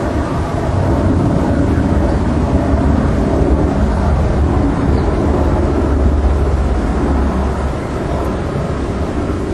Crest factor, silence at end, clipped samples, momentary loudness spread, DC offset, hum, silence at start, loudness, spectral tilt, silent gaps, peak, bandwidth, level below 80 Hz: 12 dB; 0 s; under 0.1%; 5 LU; under 0.1%; none; 0 s; -15 LUFS; -8.5 dB/octave; none; 0 dBFS; 10.5 kHz; -18 dBFS